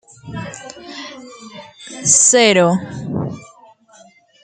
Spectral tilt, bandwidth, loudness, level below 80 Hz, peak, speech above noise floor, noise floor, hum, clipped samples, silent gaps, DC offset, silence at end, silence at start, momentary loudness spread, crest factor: -2.5 dB/octave; 10.5 kHz; -13 LUFS; -56 dBFS; 0 dBFS; 34 dB; -48 dBFS; none; under 0.1%; none; under 0.1%; 1.05 s; 0.25 s; 26 LU; 18 dB